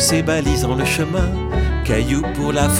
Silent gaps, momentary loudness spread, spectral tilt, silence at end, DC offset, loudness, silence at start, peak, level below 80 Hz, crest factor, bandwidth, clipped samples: none; 3 LU; -4.5 dB/octave; 0 s; under 0.1%; -18 LUFS; 0 s; -2 dBFS; -24 dBFS; 16 dB; over 20 kHz; under 0.1%